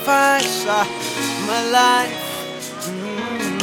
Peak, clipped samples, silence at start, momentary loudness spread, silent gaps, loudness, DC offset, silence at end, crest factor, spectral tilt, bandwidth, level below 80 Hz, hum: -2 dBFS; under 0.1%; 0 s; 13 LU; none; -19 LUFS; under 0.1%; 0 s; 18 dB; -2.5 dB/octave; 19 kHz; -62 dBFS; none